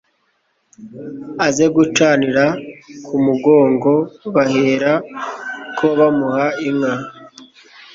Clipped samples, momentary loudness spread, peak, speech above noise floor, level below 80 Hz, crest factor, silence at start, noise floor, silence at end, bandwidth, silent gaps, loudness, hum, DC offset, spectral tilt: under 0.1%; 16 LU; 0 dBFS; 49 dB; -58 dBFS; 16 dB; 0.8 s; -64 dBFS; 0.5 s; 7.8 kHz; none; -16 LUFS; none; under 0.1%; -5.5 dB/octave